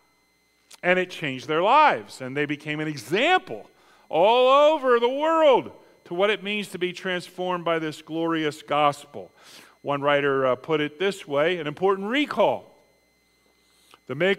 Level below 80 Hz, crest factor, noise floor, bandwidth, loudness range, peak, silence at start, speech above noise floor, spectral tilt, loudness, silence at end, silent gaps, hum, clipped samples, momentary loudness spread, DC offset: -72 dBFS; 20 dB; -65 dBFS; 15.5 kHz; 6 LU; -4 dBFS; 0.85 s; 42 dB; -5 dB/octave; -23 LUFS; 0 s; none; none; under 0.1%; 13 LU; under 0.1%